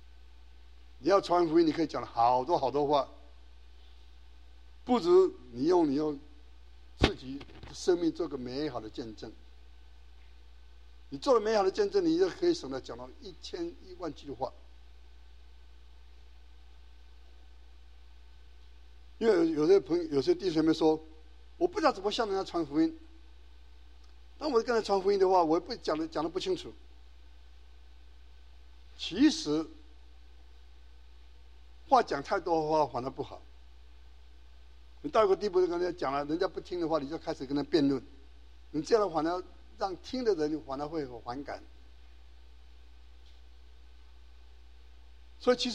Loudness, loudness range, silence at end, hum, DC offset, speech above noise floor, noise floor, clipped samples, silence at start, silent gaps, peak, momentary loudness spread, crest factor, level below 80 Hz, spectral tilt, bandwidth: -30 LUFS; 10 LU; 0 s; none; 0.2%; 26 dB; -55 dBFS; under 0.1%; 1 s; none; -6 dBFS; 16 LU; 26 dB; -54 dBFS; -5.5 dB/octave; 9.8 kHz